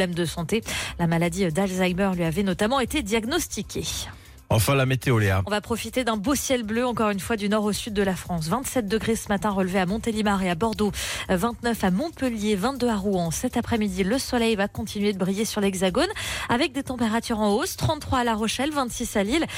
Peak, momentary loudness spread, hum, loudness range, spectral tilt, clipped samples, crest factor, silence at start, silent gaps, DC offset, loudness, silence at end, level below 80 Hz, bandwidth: -12 dBFS; 4 LU; none; 1 LU; -5 dB/octave; under 0.1%; 12 dB; 0 s; none; under 0.1%; -24 LUFS; 0 s; -44 dBFS; 16.5 kHz